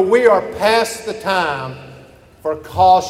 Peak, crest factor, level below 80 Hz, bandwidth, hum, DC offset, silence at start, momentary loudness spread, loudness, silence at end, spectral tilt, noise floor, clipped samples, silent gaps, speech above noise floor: 0 dBFS; 16 dB; -48 dBFS; 16 kHz; none; under 0.1%; 0 s; 14 LU; -16 LUFS; 0 s; -4 dB/octave; -43 dBFS; under 0.1%; none; 28 dB